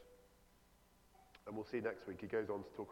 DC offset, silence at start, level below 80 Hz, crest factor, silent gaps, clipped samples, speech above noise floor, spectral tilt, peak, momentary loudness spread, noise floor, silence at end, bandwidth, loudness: under 0.1%; 0 s; -74 dBFS; 20 dB; none; under 0.1%; 26 dB; -7 dB/octave; -28 dBFS; 19 LU; -70 dBFS; 0 s; 18 kHz; -45 LUFS